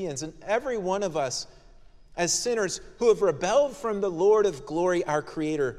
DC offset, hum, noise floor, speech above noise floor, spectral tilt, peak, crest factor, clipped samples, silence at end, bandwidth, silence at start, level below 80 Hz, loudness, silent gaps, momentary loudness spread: under 0.1%; none; -51 dBFS; 25 dB; -3.5 dB/octave; -10 dBFS; 18 dB; under 0.1%; 0 s; 13.5 kHz; 0 s; -54 dBFS; -26 LUFS; none; 9 LU